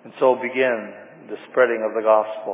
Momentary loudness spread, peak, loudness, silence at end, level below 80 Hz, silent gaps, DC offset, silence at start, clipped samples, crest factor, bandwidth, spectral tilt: 18 LU; -4 dBFS; -20 LUFS; 0 s; -86 dBFS; none; under 0.1%; 0.05 s; under 0.1%; 18 dB; 3.9 kHz; -8.5 dB/octave